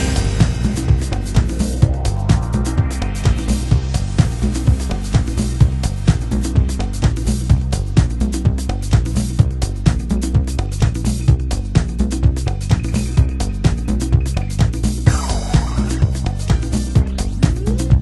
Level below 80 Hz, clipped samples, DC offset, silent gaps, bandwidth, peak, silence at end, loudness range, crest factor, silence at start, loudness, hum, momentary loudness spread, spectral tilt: -20 dBFS; under 0.1%; under 0.1%; none; 12 kHz; 0 dBFS; 0 s; 1 LU; 16 dB; 0 s; -18 LUFS; none; 3 LU; -6.5 dB/octave